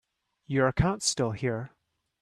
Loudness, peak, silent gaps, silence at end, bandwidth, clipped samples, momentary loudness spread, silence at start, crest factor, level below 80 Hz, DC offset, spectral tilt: -28 LUFS; -10 dBFS; none; 0.55 s; 13.5 kHz; under 0.1%; 10 LU; 0.5 s; 18 dB; -46 dBFS; under 0.1%; -4.5 dB/octave